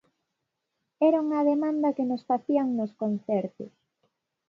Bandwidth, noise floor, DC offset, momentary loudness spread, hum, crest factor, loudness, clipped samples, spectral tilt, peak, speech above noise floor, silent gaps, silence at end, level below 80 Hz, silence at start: 6 kHz; -82 dBFS; under 0.1%; 8 LU; none; 16 dB; -26 LUFS; under 0.1%; -9 dB/octave; -12 dBFS; 56 dB; none; 0.8 s; -80 dBFS; 1 s